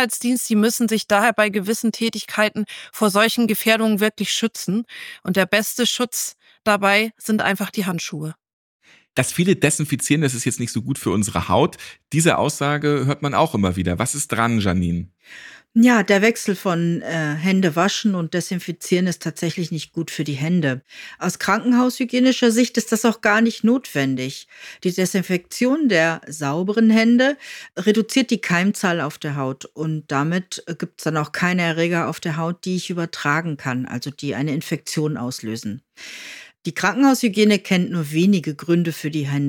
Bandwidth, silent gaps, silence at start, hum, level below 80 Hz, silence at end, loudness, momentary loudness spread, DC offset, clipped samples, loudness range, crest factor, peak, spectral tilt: 17.5 kHz; 8.53-8.80 s; 0 s; none; -54 dBFS; 0 s; -20 LUFS; 11 LU; under 0.1%; under 0.1%; 4 LU; 16 dB; -4 dBFS; -4.5 dB/octave